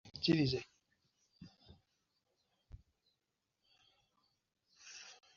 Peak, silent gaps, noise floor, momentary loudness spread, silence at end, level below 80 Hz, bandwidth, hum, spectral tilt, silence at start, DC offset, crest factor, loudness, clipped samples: -20 dBFS; none; -87 dBFS; 27 LU; 0.25 s; -70 dBFS; 7.2 kHz; none; -5 dB/octave; 0.05 s; under 0.1%; 24 dB; -35 LUFS; under 0.1%